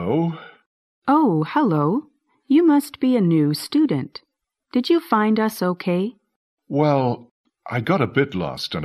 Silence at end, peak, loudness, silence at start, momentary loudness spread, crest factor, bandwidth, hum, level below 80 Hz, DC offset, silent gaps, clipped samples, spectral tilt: 0 s; -4 dBFS; -20 LUFS; 0 s; 9 LU; 18 dB; 14.5 kHz; none; -62 dBFS; under 0.1%; 0.66-1.02 s, 6.36-6.57 s, 7.31-7.44 s; under 0.1%; -7 dB/octave